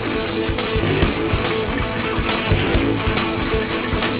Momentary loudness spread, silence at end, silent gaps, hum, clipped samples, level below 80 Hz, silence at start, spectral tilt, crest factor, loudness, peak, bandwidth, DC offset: 3 LU; 0 s; none; none; under 0.1%; -28 dBFS; 0 s; -10 dB/octave; 16 dB; -20 LUFS; -4 dBFS; 4 kHz; under 0.1%